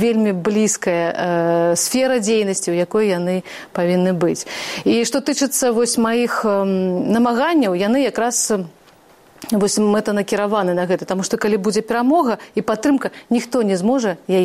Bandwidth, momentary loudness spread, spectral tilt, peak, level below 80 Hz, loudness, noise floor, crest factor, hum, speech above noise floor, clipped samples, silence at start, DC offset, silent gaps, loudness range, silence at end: 16 kHz; 5 LU; -4.5 dB/octave; -6 dBFS; -58 dBFS; -18 LUFS; -49 dBFS; 12 dB; none; 31 dB; under 0.1%; 0 s; under 0.1%; none; 2 LU; 0 s